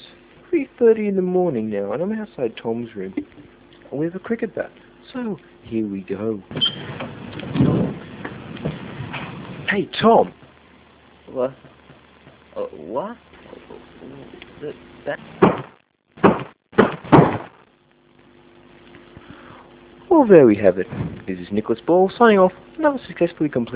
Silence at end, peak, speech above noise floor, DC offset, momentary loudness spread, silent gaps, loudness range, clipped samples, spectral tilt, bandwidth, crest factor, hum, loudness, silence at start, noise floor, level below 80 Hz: 0 s; 0 dBFS; 37 dB; under 0.1%; 20 LU; none; 14 LU; under 0.1%; -11 dB/octave; 4 kHz; 22 dB; none; -20 LUFS; 0 s; -56 dBFS; -50 dBFS